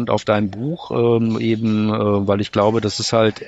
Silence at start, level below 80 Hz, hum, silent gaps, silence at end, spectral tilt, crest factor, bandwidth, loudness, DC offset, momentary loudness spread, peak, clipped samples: 0 s; -54 dBFS; none; none; 0 s; -6 dB/octave; 16 dB; 8.8 kHz; -18 LUFS; under 0.1%; 3 LU; -2 dBFS; under 0.1%